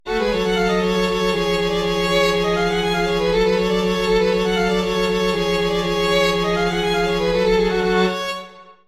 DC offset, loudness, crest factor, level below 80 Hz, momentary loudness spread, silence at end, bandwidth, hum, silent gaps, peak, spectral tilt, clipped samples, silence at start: under 0.1%; -19 LUFS; 14 dB; -36 dBFS; 2 LU; 0.15 s; 15 kHz; none; none; -4 dBFS; -5 dB/octave; under 0.1%; 0.05 s